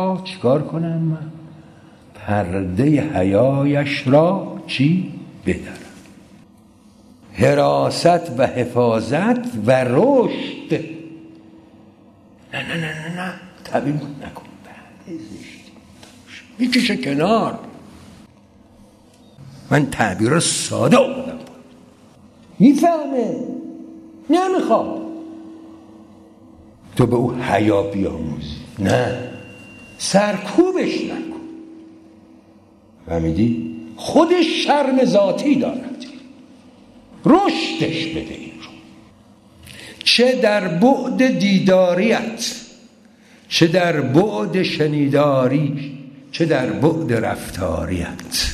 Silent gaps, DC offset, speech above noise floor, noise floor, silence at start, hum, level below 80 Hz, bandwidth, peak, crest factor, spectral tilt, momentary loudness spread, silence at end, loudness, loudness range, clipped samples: none; under 0.1%; 32 dB; -49 dBFS; 0 s; none; -48 dBFS; 13.5 kHz; 0 dBFS; 20 dB; -5.5 dB/octave; 20 LU; 0 s; -18 LUFS; 7 LU; under 0.1%